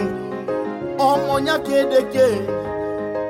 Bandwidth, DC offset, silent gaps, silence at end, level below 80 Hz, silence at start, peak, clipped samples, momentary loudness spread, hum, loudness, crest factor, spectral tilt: 16.5 kHz; under 0.1%; none; 0 s; -50 dBFS; 0 s; -4 dBFS; under 0.1%; 8 LU; none; -20 LUFS; 16 dB; -5.5 dB/octave